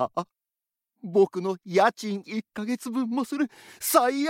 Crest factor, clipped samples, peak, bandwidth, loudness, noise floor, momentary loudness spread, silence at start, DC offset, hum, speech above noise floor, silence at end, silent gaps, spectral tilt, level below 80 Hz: 22 dB; under 0.1%; -4 dBFS; 16.5 kHz; -26 LUFS; -89 dBFS; 11 LU; 0 s; under 0.1%; none; 63 dB; 0 s; none; -4.5 dB/octave; -74 dBFS